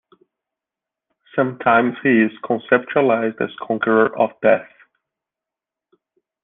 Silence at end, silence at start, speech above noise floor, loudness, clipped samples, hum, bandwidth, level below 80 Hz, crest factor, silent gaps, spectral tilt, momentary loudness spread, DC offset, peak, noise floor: 1.8 s; 1.35 s; 70 dB; -18 LUFS; under 0.1%; none; 3.9 kHz; -62 dBFS; 18 dB; none; -9.5 dB/octave; 7 LU; under 0.1%; -2 dBFS; -87 dBFS